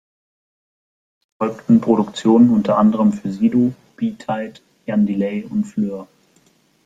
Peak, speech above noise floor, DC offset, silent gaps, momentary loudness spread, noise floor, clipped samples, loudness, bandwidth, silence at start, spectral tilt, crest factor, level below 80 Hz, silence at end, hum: -2 dBFS; 41 dB; under 0.1%; none; 12 LU; -57 dBFS; under 0.1%; -18 LUFS; 7.8 kHz; 1.4 s; -8 dB/octave; 16 dB; -58 dBFS; 0.8 s; none